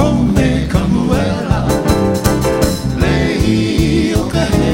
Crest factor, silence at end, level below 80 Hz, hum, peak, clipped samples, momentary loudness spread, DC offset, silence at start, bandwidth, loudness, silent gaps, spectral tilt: 12 dB; 0 s; -22 dBFS; none; 0 dBFS; under 0.1%; 3 LU; under 0.1%; 0 s; 16.5 kHz; -14 LUFS; none; -6 dB/octave